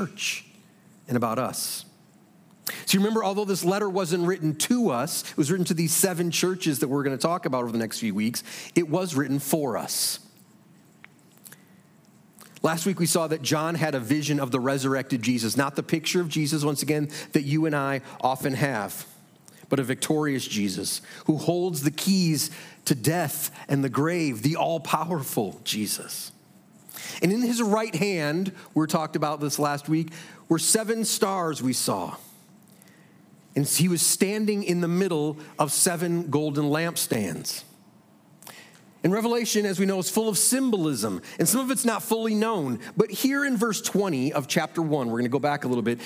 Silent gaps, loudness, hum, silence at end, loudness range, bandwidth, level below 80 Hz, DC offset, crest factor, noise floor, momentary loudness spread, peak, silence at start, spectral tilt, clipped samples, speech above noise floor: none; -25 LUFS; none; 0 s; 4 LU; 16.5 kHz; -76 dBFS; under 0.1%; 20 dB; -56 dBFS; 7 LU; -6 dBFS; 0 s; -4 dB/octave; under 0.1%; 31 dB